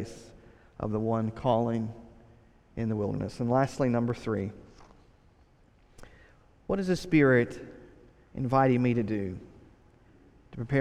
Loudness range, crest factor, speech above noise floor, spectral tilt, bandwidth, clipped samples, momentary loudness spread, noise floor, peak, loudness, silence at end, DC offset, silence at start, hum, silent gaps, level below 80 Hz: 5 LU; 20 dB; 33 dB; -7.5 dB/octave; 12 kHz; under 0.1%; 21 LU; -61 dBFS; -12 dBFS; -28 LUFS; 0 s; under 0.1%; 0 s; none; none; -54 dBFS